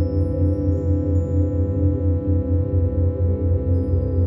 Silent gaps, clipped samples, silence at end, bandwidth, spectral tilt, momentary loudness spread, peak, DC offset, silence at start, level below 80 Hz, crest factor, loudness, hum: none; under 0.1%; 0 s; 1.9 kHz; -12.5 dB/octave; 1 LU; -8 dBFS; under 0.1%; 0 s; -28 dBFS; 12 dB; -21 LUFS; none